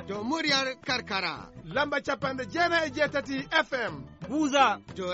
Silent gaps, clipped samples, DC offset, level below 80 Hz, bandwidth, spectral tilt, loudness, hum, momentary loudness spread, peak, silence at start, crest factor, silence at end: none; under 0.1%; under 0.1%; -58 dBFS; 8 kHz; -1.5 dB/octave; -28 LUFS; none; 9 LU; -10 dBFS; 0 s; 18 dB; 0 s